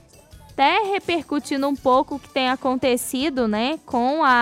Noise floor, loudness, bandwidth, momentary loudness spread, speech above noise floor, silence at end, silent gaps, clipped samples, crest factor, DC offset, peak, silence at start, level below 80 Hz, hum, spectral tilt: -47 dBFS; -21 LUFS; 16 kHz; 6 LU; 26 dB; 0 s; none; under 0.1%; 14 dB; under 0.1%; -6 dBFS; 0.35 s; -52 dBFS; none; -3.5 dB/octave